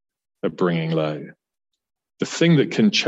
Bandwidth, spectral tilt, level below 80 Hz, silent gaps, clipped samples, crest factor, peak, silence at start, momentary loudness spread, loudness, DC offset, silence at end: 8 kHz; -5.5 dB/octave; -68 dBFS; none; under 0.1%; 16 dB; -6 dBFS; 0.45 s; 14 LU; -21 LUFS; under 0.1%; 0 s